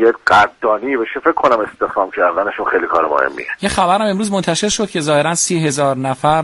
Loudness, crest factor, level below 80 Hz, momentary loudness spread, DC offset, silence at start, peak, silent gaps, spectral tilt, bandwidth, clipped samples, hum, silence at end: -15 LUFS; 14 dB; -46 dBFS; 6 LU; under 0.1%; 0 s; 0 dBFS; none; -4 dB/octave; 11.5 kHz; under 0.1%; none; 0 s